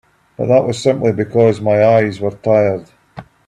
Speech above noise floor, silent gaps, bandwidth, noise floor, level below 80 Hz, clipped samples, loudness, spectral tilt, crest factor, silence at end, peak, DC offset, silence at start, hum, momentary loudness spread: 24 dB; none; 10.5 kHz; -37 dBFS; -52 dBFS; under 0.1%; -14 LUFS; -7 dB/octave; 14 dB; 0.25 s; 0 dBFS; under 0.1%; 0.4 s; none; 8 LU